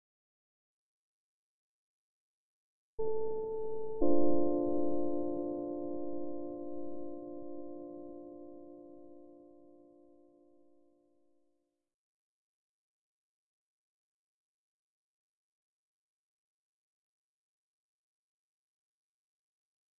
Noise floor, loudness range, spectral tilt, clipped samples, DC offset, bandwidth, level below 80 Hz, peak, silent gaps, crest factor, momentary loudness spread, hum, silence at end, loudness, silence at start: -80 dBFS; 21 LU; -12.5 dB/octave; under 0.1%; under 0.1%; 2.7 kHz; -60 dBFS; -14 dBFS; none; 22 dB; 24 LU; none; 8.3 s; -37 LUFS; 3 s